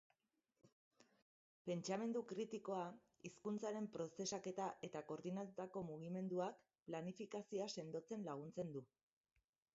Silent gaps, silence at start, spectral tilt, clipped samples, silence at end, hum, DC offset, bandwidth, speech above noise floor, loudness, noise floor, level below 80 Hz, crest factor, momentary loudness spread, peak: 0.72-0.91 s, 1.22-1.65 s, 6.82-6.86 s; 0.65 s; -5.5 dB/octave; under 0.1%; 0.9 s; none; under 0.1%; 7.6 kHz; 41 dB; -48 LUFS; -89 dBFS; -88 dBFS; 18 dB; 7 LU; -32 dBFS